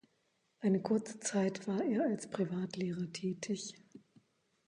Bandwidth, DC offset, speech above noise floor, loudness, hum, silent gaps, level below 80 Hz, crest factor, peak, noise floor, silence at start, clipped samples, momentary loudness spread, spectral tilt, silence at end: 11 kHz; under 0.1%; 42 dB; -36 LUFS; none; none; -80 dBFS; 16 dB; -22 dBFS; -78 dBFS; 0.6 s; under 0.1%; 6 LU; -5.5 dB/octave; 0.7 s